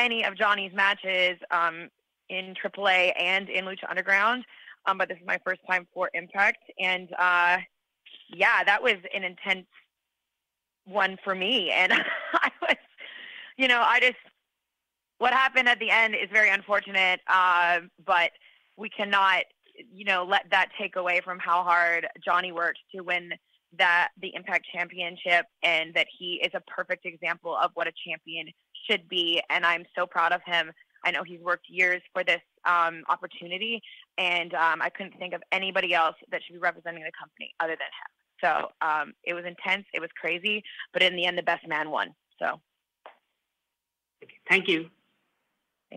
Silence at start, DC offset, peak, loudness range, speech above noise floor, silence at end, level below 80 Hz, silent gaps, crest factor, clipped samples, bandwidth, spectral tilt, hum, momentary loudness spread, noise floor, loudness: 0 s; under 0.1%; -6 dBFS; 6 LU; 60 dB; 0 s; -76 dBFS; none; 20 dB; under 0.1%; 15.5 kHz; -3 dB/octave; none; 13 LU; -86 dBFS; -25 LUFS